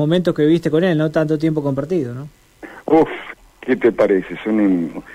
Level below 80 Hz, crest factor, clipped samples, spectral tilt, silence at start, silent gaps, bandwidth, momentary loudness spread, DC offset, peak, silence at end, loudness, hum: -50 dBFS; 14 dB; under 0.1%; -8 dB/octave; 0 s; none; 11.5 kHz; 16 LU; under 0.1%; -4 dBFS; 0 s; -17 LUFS; none